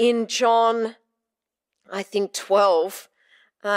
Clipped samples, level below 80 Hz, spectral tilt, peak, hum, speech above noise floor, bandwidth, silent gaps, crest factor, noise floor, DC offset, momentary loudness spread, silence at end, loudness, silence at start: under 0.1%; -88 dBFS; -3 dB/octave; -6 dBFS; none; 66 dB; 16 kHz; none; 16 dB; -86 dBFS; under 0.1%; 15 LU; 0 s; -21 LUFS; 0 s